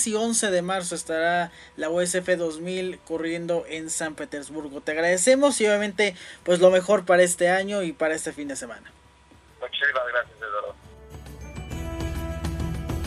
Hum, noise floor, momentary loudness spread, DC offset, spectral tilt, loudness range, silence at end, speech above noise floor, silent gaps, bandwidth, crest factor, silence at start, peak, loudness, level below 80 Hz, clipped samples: none; -54 dBFS; 16 LU; under 0.1%; -3.5 dB/octave; 9 LU; 0 s; 30 dB; none; 13.5 kHz; 20 dB; 0 s; -4 dBFS; -24 LUFS; -42 dBFS; under 0.1%